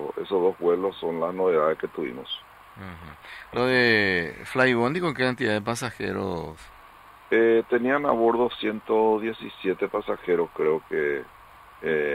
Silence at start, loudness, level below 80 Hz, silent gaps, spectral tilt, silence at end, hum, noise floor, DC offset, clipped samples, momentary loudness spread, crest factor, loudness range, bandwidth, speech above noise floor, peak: 0 s; -25 LUFS; -58 dBFS; none; -5.5 dB/octave; 0 s; none; -49 dBFS; under 0.1%; under 0.1%; 14 LU; 20 dB; 3 LU; 15 kHz; 25 dB; -6 dBFS